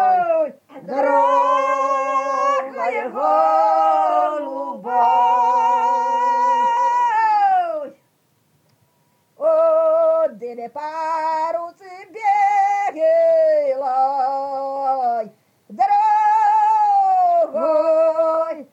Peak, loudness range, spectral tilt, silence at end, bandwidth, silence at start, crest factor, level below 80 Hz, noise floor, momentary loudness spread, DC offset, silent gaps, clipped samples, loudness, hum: -6 dBFS; 3 LU; -4 dB/octave; 0.1 s; 8.4 kHz; 0 s; 12 dB; under -90 dBFS; -63 dBFS; 10 LU; under 0.1%; none; under 0.1%; -18 LUFS; none